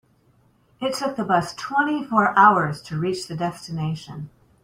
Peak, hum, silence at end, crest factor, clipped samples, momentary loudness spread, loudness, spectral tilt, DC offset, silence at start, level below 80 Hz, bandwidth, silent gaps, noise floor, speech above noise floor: -2 dBFS; none; 0.35 s; 20 dB; under 0.1%; 15 LU; -22 LUFS; -5.5 dB/octave; under 0.1%; 0.8 s; -60 dBFS; 16 kHz; none; -60 dBFS; 38 dB